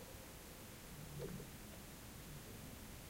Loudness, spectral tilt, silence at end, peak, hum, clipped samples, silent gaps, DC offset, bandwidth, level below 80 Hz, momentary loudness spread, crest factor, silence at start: -53 LUFS; -4 dB/octave; 0 s; -36 dBFS; none; under 0.1%; none; under 0.1%; 16 kHz; -62 dBFS; 5 LU; 18 dB; 0 s